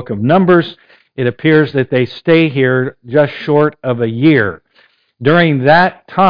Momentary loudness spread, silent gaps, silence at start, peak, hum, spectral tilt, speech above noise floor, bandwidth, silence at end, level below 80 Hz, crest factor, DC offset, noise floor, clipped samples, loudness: 8 LU; none; 0 s; 0 dBFS; none; -9 dB/octave; 41 dB; 5.2 kHz; 0 s; -52 dBFS; 12 dB; under 0.1%; -52 dBFS; under 0.1%; -12 LUFS